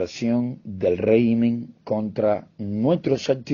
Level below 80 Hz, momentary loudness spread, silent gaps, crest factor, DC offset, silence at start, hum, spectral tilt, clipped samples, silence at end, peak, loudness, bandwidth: -58 dBFS; 9 LU; none; 16 dB; under 0.1%; 0 s; none; -7.5 dB/octave; under 0.1%; 0 s; -6 dBFS; -23 LUFS; 7.2 kHz